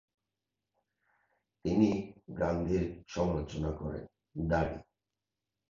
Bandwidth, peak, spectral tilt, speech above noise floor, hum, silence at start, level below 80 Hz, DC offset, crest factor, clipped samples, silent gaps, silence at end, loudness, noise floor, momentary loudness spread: 7.4 kHz; -14 dBFS; -7.5 dB/octave; 58 dB; 50 Hz at -60 dBFS; 1.65 s; -48 dBFS; under 0.1%; 22 dB; under 0.1%; none; 0.9 s; -33 LUFS; -90 dBFS; 15 LU